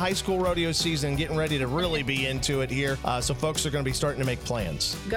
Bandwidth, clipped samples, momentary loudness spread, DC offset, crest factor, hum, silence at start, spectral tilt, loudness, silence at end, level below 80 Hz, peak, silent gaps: 16.5 kHz; under 0.1%; 3 LU; under 0.1%; 16 dB; none; 0 s; -4 dB/octave; -27 LUFS; 0 s; -40 dBFS; -12 dBFS; none